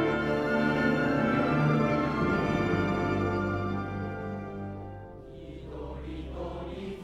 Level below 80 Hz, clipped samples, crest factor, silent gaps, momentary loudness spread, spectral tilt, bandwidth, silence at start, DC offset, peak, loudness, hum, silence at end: -46 dBFS; under 0.1%; 14 dB; none; 16 LU; -7.5 dB/octave; 11.5 kHz; 0 s; under 0.1%; -14 dBFS; -29 LUFS; none; 0 s